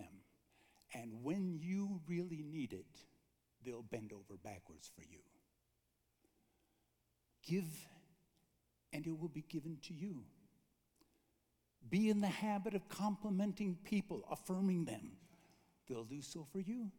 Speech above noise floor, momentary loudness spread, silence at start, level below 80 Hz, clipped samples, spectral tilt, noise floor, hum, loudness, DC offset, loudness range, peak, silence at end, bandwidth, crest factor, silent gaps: 40 dB; 17 LU; 0 s; -80 dBFS; under 0.1%; -6.5 dB/octave; -83 dBFS; none; -43 LUFS; under 0.1%; 15 LU; -26 dBFS; 0 s; 18.5 kHz; 20 dB; none